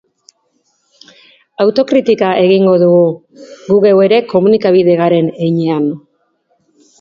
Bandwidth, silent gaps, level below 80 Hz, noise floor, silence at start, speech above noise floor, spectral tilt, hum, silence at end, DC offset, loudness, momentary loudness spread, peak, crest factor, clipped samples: 7.2 kHz; none; -58 dBFS; -61 dBFS; 1.6 s; 51 dB; -8 dB/octave; none; 1 s; under 0.1%; -11 LUFS; 9 LU; 0 dBFS; 12 dB; under 0.1%